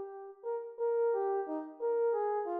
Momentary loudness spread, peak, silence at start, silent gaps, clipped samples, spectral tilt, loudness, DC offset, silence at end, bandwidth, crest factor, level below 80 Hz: 9 LU; -24 dBFS; 0 s; none; under 0.1%; -3.5 dB/octave; -34 LUFS; under 0.1%; 0 s; 2.5 kHz; 10 dB; -88 dBFS